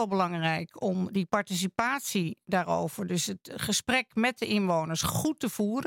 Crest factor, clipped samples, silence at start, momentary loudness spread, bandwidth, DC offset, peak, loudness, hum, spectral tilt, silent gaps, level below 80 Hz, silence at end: 20 dB; under 0.1%; 0 s; 5 LU; 17 kHz; under 0.1%; -10 dBFS; -29 LUFS; none; -4 dB/octave; none; -62 dBFS; 0 s